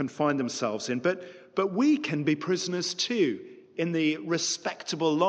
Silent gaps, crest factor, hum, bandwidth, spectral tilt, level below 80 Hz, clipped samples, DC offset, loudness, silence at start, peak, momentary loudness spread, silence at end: none; 16 dB; none; 9.4 kHz; -4 dB/octave; -78 dBFS; under 0.1%; under 0.1%; -28 LUFS; 0 s; -12 dBFS; 8 LU; 0 s